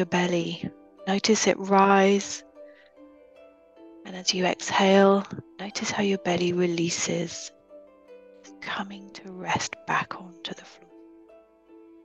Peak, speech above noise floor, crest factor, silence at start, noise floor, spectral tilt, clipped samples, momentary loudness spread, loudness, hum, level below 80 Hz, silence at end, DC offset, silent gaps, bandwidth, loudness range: -6 dBFS; 30 dB; 22 dB; 0 s; -54 dBFS; -4 dB/octave; under 0.1%; 19 LU; -24 LUFS; none; -66 dBFS; 1.35 s; under 0.1%; none; 8.6 kHz; 9 LU